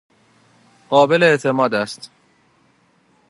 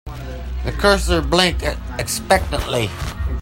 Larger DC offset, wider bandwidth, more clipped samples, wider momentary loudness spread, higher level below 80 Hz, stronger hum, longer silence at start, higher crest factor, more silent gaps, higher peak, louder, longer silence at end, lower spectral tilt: neither; second, 11.5 kHz vs 16.5 kHz; neither; about the same, 13 LU vs 11 LU; second, -70 dBFS vs -26 dBFS; neither; first, 0.9 s vs 0.05 s; about the same, 20 dB vs 20 dB; neither; about the same, 0 dBFS vs 0 dBFS; first, -16 LUFS vs -19 LUFS; first, 1.25 s vs 0 s; about the same, -5 dB/octave vs -4 dB/octave